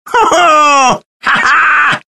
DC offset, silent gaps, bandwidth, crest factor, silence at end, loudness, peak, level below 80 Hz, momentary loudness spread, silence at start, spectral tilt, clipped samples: under 0.1%; 1.05-1.20 s; 12.5 kHz; 10 dB; 0.15 s; -8 LUFS; 0 dBFS; -46 dBFS; 6 LU; 0.05 s; -2 dB/octave; under 0.1%